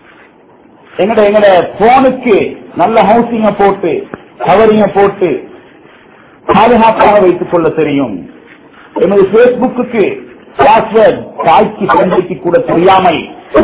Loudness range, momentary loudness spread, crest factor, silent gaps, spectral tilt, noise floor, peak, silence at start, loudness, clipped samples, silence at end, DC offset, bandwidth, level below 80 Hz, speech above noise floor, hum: 2 LU; 11 LU; 8 dB; none; -10 dB/octave; -41 dBFS; 0 dBFS; 0.95 s; -9 LUFS; 0.9%; 0 s; under 0.1%; 4 kHz; -40 dBFS; 33 dB; none